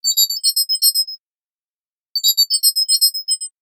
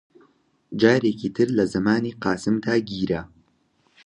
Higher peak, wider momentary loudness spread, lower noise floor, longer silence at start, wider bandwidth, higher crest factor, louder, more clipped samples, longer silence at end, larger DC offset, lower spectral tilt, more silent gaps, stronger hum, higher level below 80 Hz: first, 0 dBFS vs -4 dBFS; about the same, 8 LU vs 8 LU; first, under -90 dBFS vs -65 dBFS; second, 0.05 s vs 0.7 s; first, 19.5 kHz vs 10.5 kHz; about the same, 18 dB vs 20 dB; first, -14 LUFS vs -22 LUFS; neither; second, 0.15 s vs 0.8 s; neither; second, 9.5 dB/octave vs -6.5 dB/octave; first, 1.18-2.14 s vs none; neither; second, -88 dBFS vs -54 dBFS